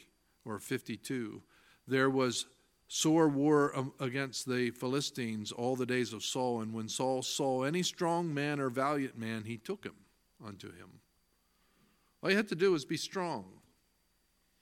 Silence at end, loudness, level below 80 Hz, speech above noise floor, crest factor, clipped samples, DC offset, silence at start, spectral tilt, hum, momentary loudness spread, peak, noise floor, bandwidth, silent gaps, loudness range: 1.1 s; -34 LUFS; -76 dBFS; 41 dB; 20 dB; under 0.1%; under 0.1%; 0.45 s; -4.5 dB/octave; none; 15 LU; -14 dBFS; -75 dBFS; 16.5 kHz; none; 7 LU